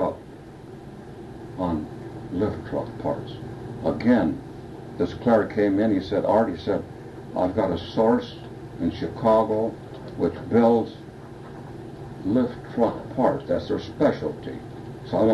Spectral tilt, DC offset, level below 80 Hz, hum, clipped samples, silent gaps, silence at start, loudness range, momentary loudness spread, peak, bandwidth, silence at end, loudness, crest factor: -8 dB/octave; under 0.1%; -50 dBFS; none; under 0.1%; none; 0 s; 4 LU; 19 LU; -6 dBFS; 11.5 kHz; 0 s; -24 LUFS; 18 dB